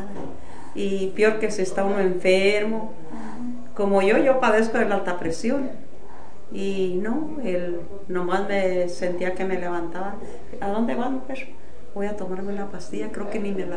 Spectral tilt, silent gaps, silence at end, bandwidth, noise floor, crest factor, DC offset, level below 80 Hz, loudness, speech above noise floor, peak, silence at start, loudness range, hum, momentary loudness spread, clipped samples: -5.5 dB/octave; none; 0 s; 10 kHz; -45 dBFS; 18 dB; 6%; -52 dBFS; -24 LUFS; 21 dB; -6 dBFS; 0 s; 8 LU; none; 17 LU; under 0.1%